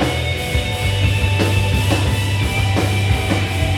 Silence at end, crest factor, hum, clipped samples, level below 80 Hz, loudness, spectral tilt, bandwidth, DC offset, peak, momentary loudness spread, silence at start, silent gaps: 0 s; 14 dB; none; under 0.1%; -26 dBFS; -18 LUFS; -5 dB/octave; 16 kHz; under 0.1%; -2 dBFS; 3 LU; 0 s; none